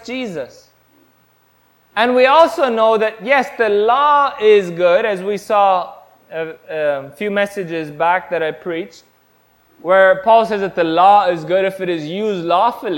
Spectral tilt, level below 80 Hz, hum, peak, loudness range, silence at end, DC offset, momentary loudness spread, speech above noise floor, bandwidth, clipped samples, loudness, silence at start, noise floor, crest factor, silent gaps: -5 dB/octave; -60 dBFS; none; 0 dBFS; 7 LU; 0 s; under 0.1%; 15 LU; 41 dB; 16.5 kHz; under 0.1%; -15 LUFS; 0.05 s; -56 dBFS; 16 dB; none